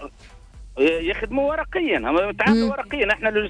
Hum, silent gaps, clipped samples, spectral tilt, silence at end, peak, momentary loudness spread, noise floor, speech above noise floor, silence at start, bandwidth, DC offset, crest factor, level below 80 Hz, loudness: none; none; under 0.1%; -6 dB/octave; 0 s; -8 dBFS; 5 LU; -45 dBFS; 24 dB; 0 s; 10 kHz; under 0.1%; 14 dB; -40 dBFS; -21 LUFS